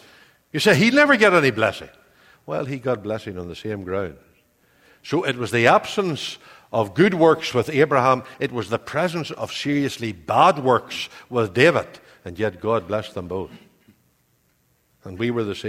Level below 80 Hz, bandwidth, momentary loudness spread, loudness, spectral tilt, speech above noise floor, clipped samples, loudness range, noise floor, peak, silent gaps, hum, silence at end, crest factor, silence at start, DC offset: -58 dBFS; 16 kHz; 15 LU; -20 LUFS; -5.5 dB/octave; 44 dB; under 0.1%; 9 LU; -64 dBFS; 0 dBFS; none; none; 0 s; 22 dB; 0.55 s; under 0.1%